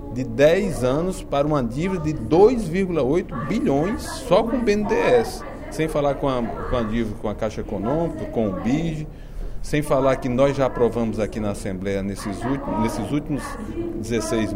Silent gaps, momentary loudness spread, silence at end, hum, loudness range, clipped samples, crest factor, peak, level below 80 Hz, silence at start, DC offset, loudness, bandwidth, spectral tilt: none; 10 LU; 0 s; none; 5 LU; under 0.1%; 18 dB; -2 dBFS; -36 dBFS; 0 s; under 0.1%; -22 LUFS; 16 kHz; -6.5 dB/octave